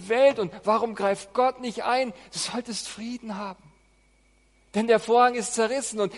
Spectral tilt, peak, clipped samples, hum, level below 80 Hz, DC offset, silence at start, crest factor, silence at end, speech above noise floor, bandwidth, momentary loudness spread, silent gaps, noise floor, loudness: -3.5 dB/octave; -8 dBFS; under 0.1%; none; -64 dBFS; under 0.1%; 0 s; 18 dB; 0 s; 37 dB; 11.5 kHz; 14 LU; none; -62 dBFS; -25 LUFS